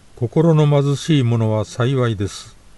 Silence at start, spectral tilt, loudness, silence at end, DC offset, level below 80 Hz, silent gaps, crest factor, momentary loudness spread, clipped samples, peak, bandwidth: 0.2 s; -7 dB/octave; -17 LUFS; 0.35 s; under 0.1%; -48 dBFS; none; 14 dB; 10 LU; under 0.1%; -4 dBFS; 11.5 kHz